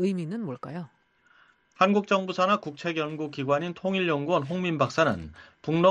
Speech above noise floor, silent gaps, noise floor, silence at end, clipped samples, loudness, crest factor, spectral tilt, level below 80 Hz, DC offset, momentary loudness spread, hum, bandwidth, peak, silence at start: 35 dB; none; -62 dBFS; 0 s; under 0.1%; -27 LUFS; 20 dB; -6.5 dB/octave; -62 dBFS; under 0.1%; 14 LU; none; 9.6 kHz; -6 dBFS; 0 s